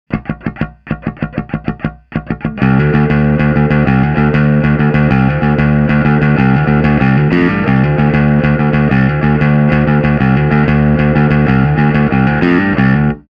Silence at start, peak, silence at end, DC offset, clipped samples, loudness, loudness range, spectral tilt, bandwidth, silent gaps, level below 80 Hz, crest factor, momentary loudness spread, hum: 0.1 s; 0 dBFS; 0.15 s; under 0.1%; under 0.1%; -11 LUFS; 3 LU; -10 dB/octave; 5.2 kHz; none; -26 dBFS; 10 dB; 10 LU; none